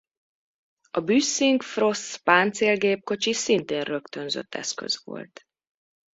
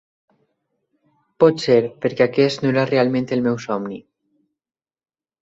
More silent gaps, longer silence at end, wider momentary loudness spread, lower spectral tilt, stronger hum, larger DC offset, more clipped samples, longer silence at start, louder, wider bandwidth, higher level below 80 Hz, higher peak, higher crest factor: neither; second, 0.85 s vs 1.4 s; about the same, 11 LU vs 9 LU; second, -3 dB/octave vs -6.5 dB/octave; neither; neither; neither; second, 0.95 s vs 1.4 s; second, -24 LUFS vs -19 LUFS; about the same, 8 kHz vs 7.8 kHz; second, -70 dBFS vs -62 dBFS; about the same, -4 dBFS vs -2 dBFS; about the same, 22 dB vs 20 dB